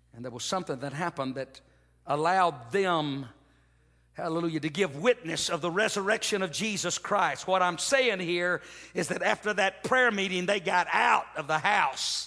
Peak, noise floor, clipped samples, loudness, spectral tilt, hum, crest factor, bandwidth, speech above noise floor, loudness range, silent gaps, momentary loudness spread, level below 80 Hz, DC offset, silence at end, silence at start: -10 dBFS; -64 dBFS; under 0.1%; -28 LUFS; -3 dB/octave; none; 20 dB; 11 kHz; 36 dB; 4 LU; none; 10 LU; -66 dBFS; under 0.1%; 0 s; 0.15 s